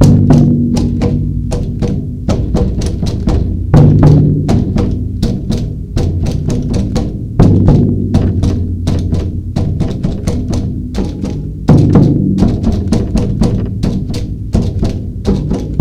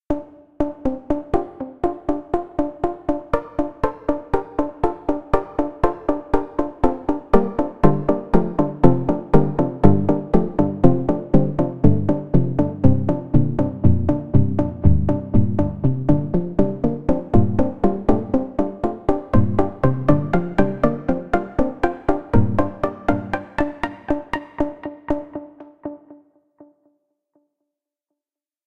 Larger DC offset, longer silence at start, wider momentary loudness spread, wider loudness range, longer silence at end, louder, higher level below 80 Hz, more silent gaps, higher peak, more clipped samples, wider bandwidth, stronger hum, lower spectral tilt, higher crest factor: second, under 0.1% vs 3%; about the same, 0 s vs 0 s; about the same, 10 LU vs 9 LU; second, 4 LU vs 7 LU; about the same, 0 s vs 0 s; first, -13 LUFS vs -21 LUFS; first, -20 dBFS vs -32 dBFS; neither; about the same, 0 dBFS vs 0 dBFS; first, 0.6% vs under 0.1%; first, 10.5 kHz vs 6.8 kHz; neither; second, -8.5 dB/octave vs -10 dB/octave; second, 12 dB vs 20 dB